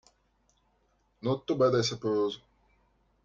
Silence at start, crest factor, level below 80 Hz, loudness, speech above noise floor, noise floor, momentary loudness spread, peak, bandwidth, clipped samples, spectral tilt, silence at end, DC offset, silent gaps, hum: 1.25 s; 20 dB; -64 dBFS; -29 LUFS; 43 dB; -71 dBFS; 10 LU; -12 dBFS; 7.6 kHz; under 0.1%; -5.5 dB/octave; 0.85 s; under 0.1%; none; none